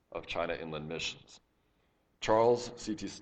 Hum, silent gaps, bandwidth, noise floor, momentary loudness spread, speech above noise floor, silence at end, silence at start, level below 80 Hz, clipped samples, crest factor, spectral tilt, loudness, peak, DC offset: none; none; 8.8 kHz; -73 dBFS; 12 LU; 40 dB; 0 s; 0.1 s; -60 dBFS; under 0.1%; 20 dB; -4.5 dB/octave; -33 LUFS; -14 dBFS; under 0.1%